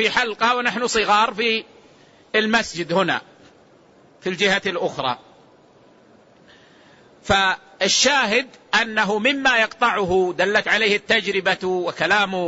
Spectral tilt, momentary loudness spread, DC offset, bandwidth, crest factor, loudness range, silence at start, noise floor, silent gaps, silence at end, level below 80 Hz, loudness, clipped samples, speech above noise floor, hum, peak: -2.5 dB/octave; 7 LU; under 0.1%; 8 kHz; 16 dB; 8 LU; 0 s; -52 dBFS; none; 0 s; -54 dBFS; -19 LUFS; under 0.1%; 32 dB; none; -4 dBFS